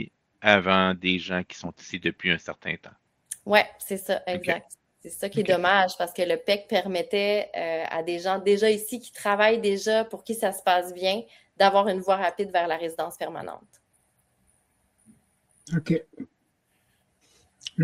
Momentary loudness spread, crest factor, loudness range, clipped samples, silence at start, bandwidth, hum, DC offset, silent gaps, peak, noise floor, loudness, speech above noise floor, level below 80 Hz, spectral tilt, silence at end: 15 LU; 26 dB; 11 LU; under 0.1%; 0 s; 16 kHz; none; under 0.1%; none; 0 dBFS; -71 dBFS; -25 LUFS; 46 dB; -66 dBFS; -4.5 dB/octave; 0 s